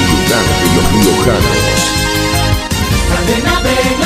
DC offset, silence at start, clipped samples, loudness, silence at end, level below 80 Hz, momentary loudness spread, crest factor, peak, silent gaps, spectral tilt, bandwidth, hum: under 0.1%; 0 s; under 0.1%; -11 LUFS; 0 s; -20 dBFS; 3 LU; 12 dB; 0 dBFS; none; -4 dB/octave; 16 kHz; none